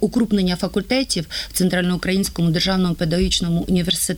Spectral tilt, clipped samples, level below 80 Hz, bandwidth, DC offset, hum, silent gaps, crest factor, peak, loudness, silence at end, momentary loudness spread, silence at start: -4.5 dB/octave; under 0.1%; -36 dBFS; 18.5 kHz; under 0.1%; none; none; 12 dB; -6 dBFS; -19 LUFS; 0 s; 3 LU; 0 s